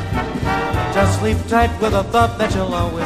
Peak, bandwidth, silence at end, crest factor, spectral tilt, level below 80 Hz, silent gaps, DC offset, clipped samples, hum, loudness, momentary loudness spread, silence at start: 0 dBFS; 15.5 kHz; 0 s; 16 dB; -6 dB/octave; -28 dBFS; none; under 0.1%; under 0.1%; none; -18 LUFS; 4 LU; 0 s